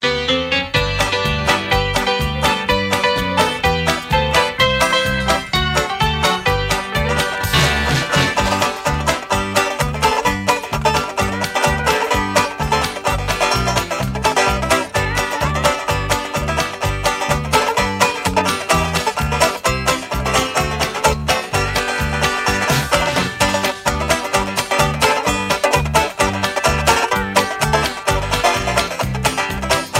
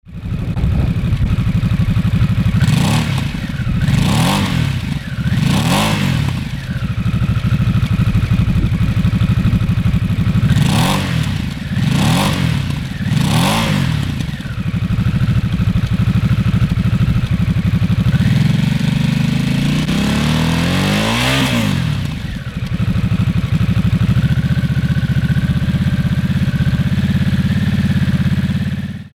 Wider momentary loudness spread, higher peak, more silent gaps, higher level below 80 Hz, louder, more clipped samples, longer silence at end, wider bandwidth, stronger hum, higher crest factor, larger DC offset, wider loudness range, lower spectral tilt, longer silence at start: about the same, 4 LU vs 6 LU; about the same, 0 dBFS vs -2 dBFS; neither; about the same, -30 dBFS vs -26 dBFS; about the same, -17 LUFS vs -16 LUFS; neither; about the same, 0 s vs 0.05 s; about the same, 16.5 kHz vs 17 kHz; neither; about the same, 16 dB vs 14 dB; neither; about the same, 2 LU vs 2 LU; second, -3.5 dB/octave vs -6 dB/octave; about the same, 0 s vs 0.05 s